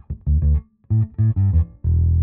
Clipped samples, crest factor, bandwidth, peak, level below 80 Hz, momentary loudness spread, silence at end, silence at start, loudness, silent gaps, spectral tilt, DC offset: under 0.1%; 10 dB; 1.9 kHz; -8 dBFS; -22 dBFS; 4 LU; 0 s; 0.1 s; -20 LUFS; none; -14.5 dB/octave; under 0.1%